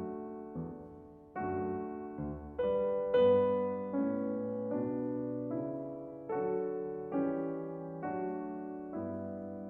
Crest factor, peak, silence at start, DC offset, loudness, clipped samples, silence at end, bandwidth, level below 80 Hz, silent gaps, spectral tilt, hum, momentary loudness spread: 18 dB; -18 dBFS; 0 s; under 0.1%; -36 LUFS; under 0.1%; 0 s; 3.7 kHz; -62 dBFS; none; -10 dB/octave; none; 13 LU